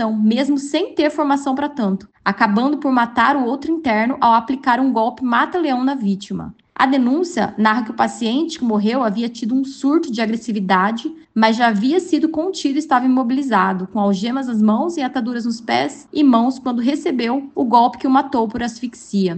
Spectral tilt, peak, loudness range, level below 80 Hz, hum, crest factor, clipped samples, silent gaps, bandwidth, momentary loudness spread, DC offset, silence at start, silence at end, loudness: -5.5 dB/octave; 0 dBFS; 2 LU; -58 dBFS; none; 16 dB; under 0.1%; none; 8.8 kHz; 7 LU; under 0.1%; 0 s; 0 s; -18 LUFS